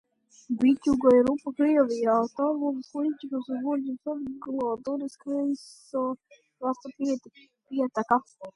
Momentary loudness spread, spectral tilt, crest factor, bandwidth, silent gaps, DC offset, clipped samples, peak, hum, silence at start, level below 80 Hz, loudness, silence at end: 12 LU; -6.5 dB/octave; 18 dB; 11 kHz; none; under 0.1%; under 0.1%; -8 dBFS; none; 0.5 s; -64 dBFS; -27 LUFS; 0.05 s